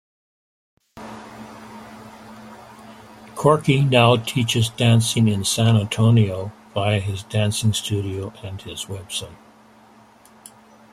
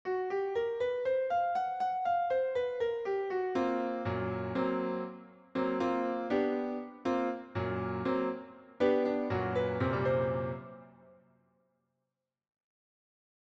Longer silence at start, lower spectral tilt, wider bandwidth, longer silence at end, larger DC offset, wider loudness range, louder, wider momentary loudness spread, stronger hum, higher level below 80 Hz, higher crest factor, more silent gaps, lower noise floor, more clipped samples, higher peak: first, 0.95 s vs 0.05 s; second, -5 dB/octave vs -8 dB/octave; first, 14 kHz vs 7.4 kHz; second, 1.6 s vs 2.65 s; neither; first, 10 LU vs 4 LU; first, -20 LUFS vs -33 LUFS; first, 24 LU vs 7 LU; neither; first, -54 dBFS vs -66 dBFS; about the same, 20 dB vs 18 dB; neither; second, -50 dBFS vs -88 dBFS; neither; first, -2 dBFS vs -16 dBFS